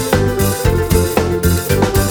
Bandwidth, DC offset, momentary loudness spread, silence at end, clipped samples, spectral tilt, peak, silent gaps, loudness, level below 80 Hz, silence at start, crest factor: over 20 kHz; under 0.1%; 2 LU; 0 s; under 0.1%; -5.5 dB/octave; 0 dBFS; none; -15 LUFS; -24 dBFS; 0 s; 14 dB